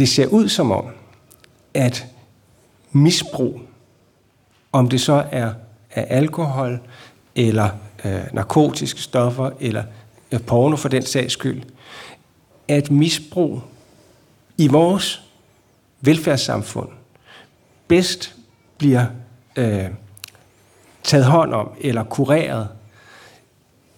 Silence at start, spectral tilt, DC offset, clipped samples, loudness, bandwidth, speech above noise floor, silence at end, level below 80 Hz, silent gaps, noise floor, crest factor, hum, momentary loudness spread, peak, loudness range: 0 s; -5.5 dB/octave; under 0.1%; under 0.1%; -19 LUFS; 17.5 kHz; 40 dB; 1.2 s; -58 dBFS; none; -58 dBFS; 18 dB; none; 17 LU; -2 dBFS; 2 LU